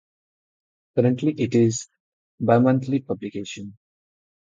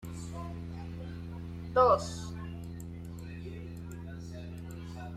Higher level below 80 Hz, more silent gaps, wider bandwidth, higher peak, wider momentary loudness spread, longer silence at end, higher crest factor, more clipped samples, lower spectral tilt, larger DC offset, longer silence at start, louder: second, -62 dBFS vs -54 dBFS; first, 2.00-2.38 s vs none; second, 9 kHz vs 14 kHz; first, -4 dBFS vs -12 dBFS; about the same, 17 LU vs 17 LU; first, 0.75 s vs 0 s; about the same, 20 dB vs 22 dB; neither; about the same, -6.5 dB/octave vs -6.5 dB/octave; neither; first, 0.95 s vs 0 s; first, -22 LUFS vs -35 LUFS